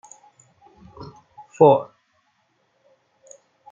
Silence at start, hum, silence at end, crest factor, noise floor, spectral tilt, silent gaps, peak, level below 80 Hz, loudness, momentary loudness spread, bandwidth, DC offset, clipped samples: 1 s; none; 1.9 s; 22 dB; -67 dBFS; -7.5 dB/octave; none; -2 dBFS; -64 dBFS; -17 LUFS; 27 LU; 7.6 kHz; under 0.1%; under 0.1%